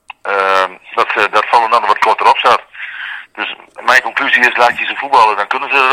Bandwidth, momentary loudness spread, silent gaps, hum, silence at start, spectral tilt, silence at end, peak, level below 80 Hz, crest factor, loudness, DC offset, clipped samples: over 20 kHz; 12 LU; none; none; 0.25 s; -1.5 dB/octave; 0 s; 0 dBFS; -58 dBFS; 12 dB; -12 LUFS; under 0.1%; 0.8%